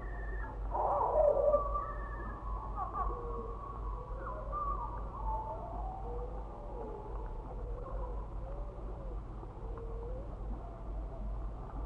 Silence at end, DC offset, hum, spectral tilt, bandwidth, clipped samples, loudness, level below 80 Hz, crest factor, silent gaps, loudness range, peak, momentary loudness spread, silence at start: 0 s; under 0.1%; none; -9.5 dB/octave; 3.8 kHz; under 0.1%; -39 LUFS; -42 dBFS; 20 dB; none; 10 LU; -18 dBFS; 14 LU; 0 s